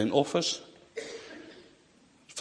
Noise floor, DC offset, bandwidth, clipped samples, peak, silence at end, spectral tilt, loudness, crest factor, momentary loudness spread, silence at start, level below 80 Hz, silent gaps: -62 dBFS; under 0.1%; 10.5 kHz; under 0.1%; -10 dBFS; 0 s; -4 dB/octave; -32 LUFS; 24 dB; 23 LU; 0 s; -72 dBFS; none